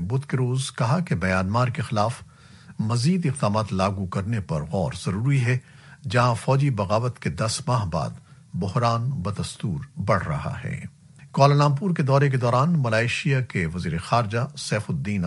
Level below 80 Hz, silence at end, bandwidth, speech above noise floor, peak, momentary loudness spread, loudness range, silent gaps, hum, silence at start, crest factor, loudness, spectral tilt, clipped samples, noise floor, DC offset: -50 dBFS; 0 s; 11.5 kHz; 25 dB; -4 dBFS; 9 LU; 4 LU; none; none; 0 s; 20 dB; -24 LUFS; -6.5 dB/octave; under 0.1%; -47 dBFS; under 0.1%